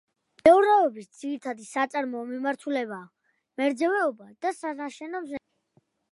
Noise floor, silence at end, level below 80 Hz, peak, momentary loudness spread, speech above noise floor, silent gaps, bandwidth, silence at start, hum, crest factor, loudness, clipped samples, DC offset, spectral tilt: -68 dBFS; 0.75 s; -70 dBFS; -4 dBFS; 18 LU; 42 dB; none; 11.5 kHz; 0.45 s; none; 22 dB; -26 LUFS; under 0.1%; under 0.1%; -4.5 dB/octave